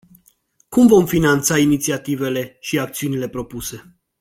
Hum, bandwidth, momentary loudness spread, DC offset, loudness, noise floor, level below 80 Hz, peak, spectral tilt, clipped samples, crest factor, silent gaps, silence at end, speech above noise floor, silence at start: none; 16.5 kHz; 15 LU; under 0.1%; -18 LUFS; -58 dBFS; -46 dBFS; -2 dBFS; -5 dB/octave; under 0.1%; 16 dB; none; 0.4 s; 41 dB; 0.7 s